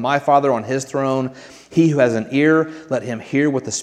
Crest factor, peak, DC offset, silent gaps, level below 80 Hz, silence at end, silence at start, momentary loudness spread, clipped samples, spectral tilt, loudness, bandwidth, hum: 16 dB; -2 dBFS; under 0.1%; none; -64 dBFS; 0 s; 0 s; 8 LU; under 0.1%; -5.5 dB/octave; -18 LUFS; 10.5 kHz; none